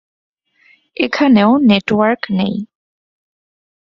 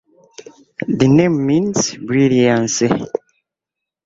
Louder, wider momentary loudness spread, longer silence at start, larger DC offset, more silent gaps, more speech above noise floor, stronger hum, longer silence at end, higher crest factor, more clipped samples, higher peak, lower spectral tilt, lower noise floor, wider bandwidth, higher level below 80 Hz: about the same, -13 LUFS vs -15 LUFS; about the same, 16 LU vs 14 LU; first, 1 s vs 0.8 s; neither; neither; second, 40 dB vs 69 dB; neither; first, 1.2 s vs 1 s; about the same, 16 dB vs 16 dB; neither; about the same, -2 dBFS vs 0 dBFS; first, -7 dB/octave vs -5.5 dB/octave; second, -53 dBFS vs -84 dBFS; about the same, 7.2 kHz vs 7.8 kHz; about the same, -54 dBFS vs -50 dBFS